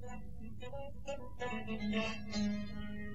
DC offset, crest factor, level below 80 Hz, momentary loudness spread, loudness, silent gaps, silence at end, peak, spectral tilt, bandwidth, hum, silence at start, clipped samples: 0.7%; 16 dB; -54 dBFS; 12 LU; -41 LUFS; none; 0 s; -24 dBFS; -5.5 dB/octave; 8.2 kHz; none; 0 s; under 0.1%